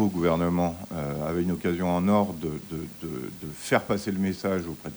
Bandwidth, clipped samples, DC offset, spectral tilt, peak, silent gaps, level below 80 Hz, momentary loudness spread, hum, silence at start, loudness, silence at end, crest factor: over 20 kHz; under 0.1%; under 0.1%; -6.5 dB/octave; -8 dBFS; none; -52 dBFS; 11 LU; none; 0 s; -28 LUFS; 0 s; 20 dB